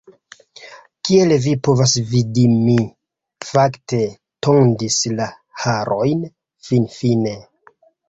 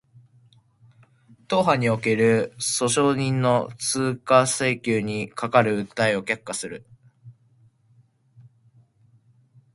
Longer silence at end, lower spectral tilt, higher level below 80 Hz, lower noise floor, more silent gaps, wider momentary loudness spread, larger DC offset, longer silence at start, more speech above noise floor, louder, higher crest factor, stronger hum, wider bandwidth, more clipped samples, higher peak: second, 0.7 s vs 2.45 s; about the same, -5.5 dB/octave vs -4.5 dB/octave; first, -52 dBFS vs -62 dBFS; second, -53 dBFS vs -60 dBFS; neither; about the same, 11 LU vs 9 LU; neither; second, 0.6 s vs 1.5 s; about the same, 37 dB vs 38 dB; first, -17 LUFS vs -22 LUFS; second, 16 dB vs 22 dB; neither; second, 8 kHz vs 12 kHz; neither; about the same, -2 dBFS vs -2 dBFS